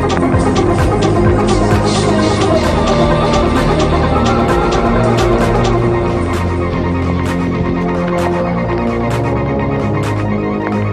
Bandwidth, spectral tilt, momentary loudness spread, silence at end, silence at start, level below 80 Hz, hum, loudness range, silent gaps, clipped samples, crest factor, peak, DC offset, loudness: 13.5 kHz; -6.5 dB/octave; 4 LU; 0 s; 0 s; -24 dBFS; none; 3 LU; none; under 0.1%; 12 dB; 0 dBFS; under 0.1%; -14 LUFS